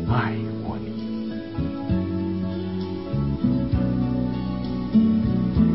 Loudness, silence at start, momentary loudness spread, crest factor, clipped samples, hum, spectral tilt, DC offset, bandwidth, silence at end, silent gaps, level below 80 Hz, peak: -25 LUFS; 0 s; 9 LU; 16 dB; under 0.1%; none; -12.5 dB/octave; 0.5%; 5.8 kHz; 0 s; none; -36 dBFS; -6 dBFS